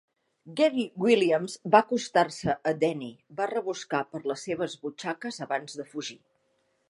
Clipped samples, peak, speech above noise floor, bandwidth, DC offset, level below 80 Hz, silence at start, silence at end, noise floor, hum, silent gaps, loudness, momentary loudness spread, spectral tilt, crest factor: under 0.1%; -4 dBFS; 45 dB; 11.5 kHz; under 0.1%; -68 dBFS; 0.45 s; 0.75 s; -72 dBFS; none; none; -28 LUFS; 14 LU; -4.5 dB/octave; 24 dB